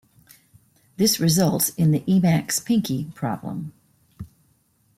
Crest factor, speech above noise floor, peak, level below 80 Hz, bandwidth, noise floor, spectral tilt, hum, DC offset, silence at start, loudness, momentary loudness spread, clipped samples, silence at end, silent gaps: 16 dB; 43 dB; -8 dBFS; -58 dBFS; 16.5 kHz; -63 dBFS; -5 dB/octave; none; under 0.1%; 1 s; -21 LUFS; 23 LU; under 0.1%; 0.7 s; none